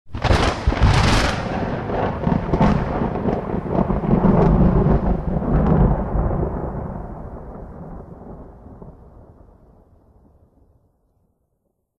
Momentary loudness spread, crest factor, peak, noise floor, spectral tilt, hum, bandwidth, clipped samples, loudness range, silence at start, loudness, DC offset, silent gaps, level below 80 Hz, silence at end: 21 LU; 16 dB; -4 dBFS; -71 dBFS; -7 dB/octave; none; 11.5 kHz; under 0.1%; 18 LU; 0.05 s; -19 LUFS; under 0.1%; none; -26 dBFS; 3.05 s